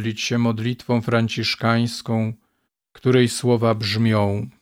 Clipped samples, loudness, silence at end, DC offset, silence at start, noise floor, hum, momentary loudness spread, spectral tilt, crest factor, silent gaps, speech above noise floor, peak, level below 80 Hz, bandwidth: under 0.1%; -21 LUFS; 0.15 s; under 0.1%; 0 s; -72 dBFS; none; 7 LU; -6 dB/octave; 16 dB; none; 52 dB; -4 dBFS; -60 dBFS; 15.5 kHz